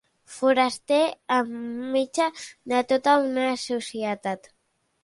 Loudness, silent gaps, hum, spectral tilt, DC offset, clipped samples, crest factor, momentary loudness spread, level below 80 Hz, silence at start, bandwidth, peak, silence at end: -24 LUFS; none; none; -3.5 dB/octave; under 0.1%; under 0.1%; 18 dB; 11 LU; -72 dBFS; 0.3 s; 11.5 kHz; -8 dBFS; 0.65 s